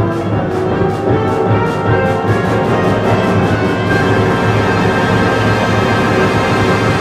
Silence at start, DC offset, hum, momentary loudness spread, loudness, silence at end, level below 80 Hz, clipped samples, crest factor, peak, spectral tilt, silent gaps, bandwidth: 0 s; under 0.1%; none; 3 LU; -13 LUFS; 0 s; -34 dBFS; under 0.1%; 10 dB; -2 dBFS; -6.5 dB/octave; none; 13.5 kHz